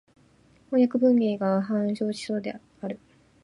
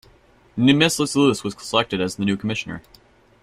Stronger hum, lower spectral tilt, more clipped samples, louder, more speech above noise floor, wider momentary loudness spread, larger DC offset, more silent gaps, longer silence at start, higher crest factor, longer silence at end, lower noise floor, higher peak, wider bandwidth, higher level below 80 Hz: neither; first, -7 dB/octave vs -4.5 dB/octave; neither; second, -25 LUFS vs -20 LUFS; about the same, 34 dB vs 34 dB; about the same, 16 LU vs 15 LU; neither; neither; first, 0.7 s vs 0.55 s; about the same, 16 dB vs 20 dB; about the same, 0.5 s vs 0.6 s; first, -59 dBFS vs -54 dBFS; second, -10 dBFS vs -2 dBFS; second, 11 kHz vs 15.5 kHz; second, -70 dBFS vs -54 dBFS